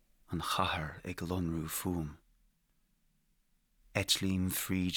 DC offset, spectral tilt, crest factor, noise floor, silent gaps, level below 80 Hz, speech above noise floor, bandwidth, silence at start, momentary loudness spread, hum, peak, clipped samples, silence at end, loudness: under 0.1%; -4 dB/octave; 22 dB; -74 dBFS; none; -58 dBFS; 40 dB; over 20 kHz; 0.3 s; 11 LU; none; -14 dBFS; under 0.1%; 0 s; -35 LUFS